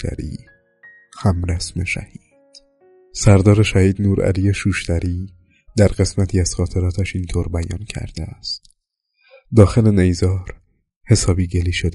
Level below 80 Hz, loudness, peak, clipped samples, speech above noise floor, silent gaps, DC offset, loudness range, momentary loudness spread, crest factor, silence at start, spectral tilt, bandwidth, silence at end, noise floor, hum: -32 dBFS; -18 LUFS; 0 dBFS; under 0.1%; 53 dB; 10.96-11.01 s; under 0.1%; 6 LU; 15 LU; 18 dB; 0 s; -6 dB/octave; 11.5 kHz; 0 s; -69 dBFS; none